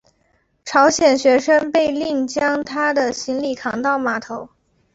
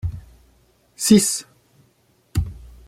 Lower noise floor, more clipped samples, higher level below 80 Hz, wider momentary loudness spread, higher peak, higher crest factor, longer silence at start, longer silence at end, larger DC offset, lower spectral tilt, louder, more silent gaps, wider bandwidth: about the same, -63 dBFS vs -61 dBFS; neither; second, -56 dBFS vs -38 dBFS; second, 10 LU vs 18 LU; about the same, -2 dBFS vs -2 dBFS; second, 16 dB vs 22 dB; first, 0.65 s vs 0.05 s; first, 0.5 s vs 0.2 s; neither; second, -3 dB/octave vs -4.5 dB/octave; about the same, -18 LUFS vs -19 LUFS; neither; second, 8 kHz vs 16 kHz